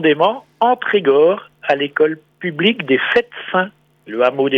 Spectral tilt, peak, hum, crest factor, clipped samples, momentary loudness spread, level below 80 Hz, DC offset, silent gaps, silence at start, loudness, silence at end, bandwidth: -7 dB/octave; -2 dBFS; none; 16 dB; under 0.1%; 9 LU; -62 dBFS; under 0.1%; none; 0 s; -16 LUFS; 0 s; 6.2 kHz